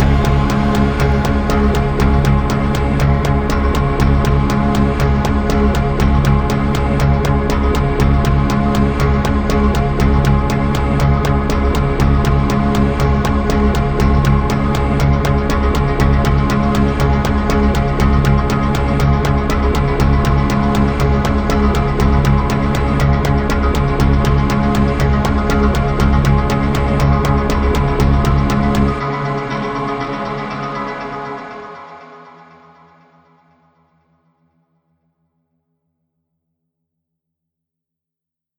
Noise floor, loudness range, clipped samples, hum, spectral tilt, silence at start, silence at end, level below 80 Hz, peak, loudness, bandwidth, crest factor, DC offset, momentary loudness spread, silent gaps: -85 dBFS; 4 LU; under 0.1%; none; -7 dB/octave; 0 s; 6.3 s; -18 dBFS; 0 dBFS; -15 LUFS; 20 kHz; 14 dB; under 0.1%; 2 LU; none